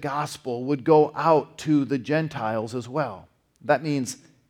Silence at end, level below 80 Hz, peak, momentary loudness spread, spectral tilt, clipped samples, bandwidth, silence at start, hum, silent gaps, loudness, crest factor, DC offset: 0.35 s; -66 dBFS; -6 dBFS; 11 LU; -6 dB/octave; under 0.1%; 15 kHz; 0 s; none; none; -24 LUFS; 18 dB; under 0.1%